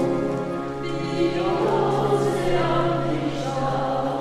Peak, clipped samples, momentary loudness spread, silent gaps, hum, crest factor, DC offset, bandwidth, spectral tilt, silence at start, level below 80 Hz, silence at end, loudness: -8 dBFS; under 0.1%; 6 LU; none; none; 14 dB; under 0.1%; 13 kHz; -6.5 dB/octave; 0 s; -44 dBFS; 0 s; -23 LUFS